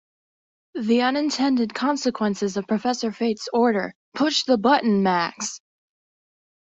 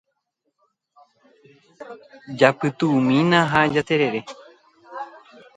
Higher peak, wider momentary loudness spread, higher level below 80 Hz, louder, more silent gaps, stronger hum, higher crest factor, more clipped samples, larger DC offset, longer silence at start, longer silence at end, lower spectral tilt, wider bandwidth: second, -4 dBFS vs 0 dBFS; second, 11 LU vs 24 LU; second, -66 dBFS vs -60 dBFS; second, -22 LUFS vs -19 LUFS; first, 3.95-4.12 s vs none; neither; about the same, 18 dB vs 22 dB; neither; neither; second, 0.75 s vs 1.8 s; first, 1.05 s vs 0.5 s; second, -4.5 dB/octave vs -6.5 dB/octave; second, 8.2 kHz vs 9.4 kHz